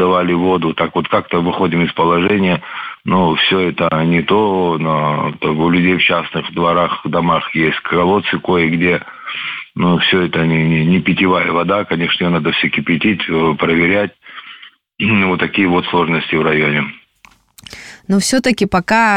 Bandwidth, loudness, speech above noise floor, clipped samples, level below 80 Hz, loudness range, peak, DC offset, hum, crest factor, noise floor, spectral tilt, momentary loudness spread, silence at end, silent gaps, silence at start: 13.5 kHz; -14 LUFS; 35 dB; under 0.1%; -46 dBFS; 2 LU; -2 dBFS; under 0.1%; none; 14 dB; -49 dBFS; -5.5 dB/octave; 7 LU; 0 s; none; 0 s